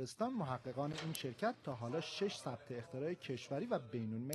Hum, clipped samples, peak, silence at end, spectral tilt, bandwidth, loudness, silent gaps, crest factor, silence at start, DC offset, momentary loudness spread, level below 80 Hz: none; under 0.1%; -20 dBFS; 0 s; -5.5 dB/octave; 12.5 kHz; -43 LUFS; none; 22 dB; 0 s; under 0.1%; 5 LU; -80 dBFS